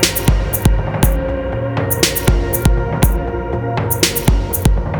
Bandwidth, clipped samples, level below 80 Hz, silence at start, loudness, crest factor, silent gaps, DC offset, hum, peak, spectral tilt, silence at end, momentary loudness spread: over 20 kHz; under 0.1%; -18 dBFS; 0 s; -16 LUFS; 14 dB; none; under 0.1%; none; 0 dBFS; -4.5 dB/octave; 0 s; 6 LU